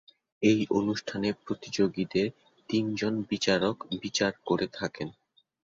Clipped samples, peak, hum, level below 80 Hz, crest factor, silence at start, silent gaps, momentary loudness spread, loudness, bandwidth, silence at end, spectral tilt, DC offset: under 0.1%; -10 dBFS; none; -64 dBFS; 20 dB; 0.4 s; none; 9 LU; -29 LUFS; 7.8 kHz; 0.55 s; -5 dB/octave; under 0.1%